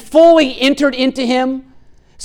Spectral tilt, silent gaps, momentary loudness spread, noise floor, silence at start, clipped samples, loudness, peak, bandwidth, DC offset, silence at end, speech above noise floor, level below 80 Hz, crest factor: -3.5 dB/octave; none; 10 LU; -43 dBFS; 0.05 s; under 0.1%; -12 LUFS; 0 dBFS; 13 kHz; under 0.1%; 0 s; 31 dB; -46 dBFS; 12 dB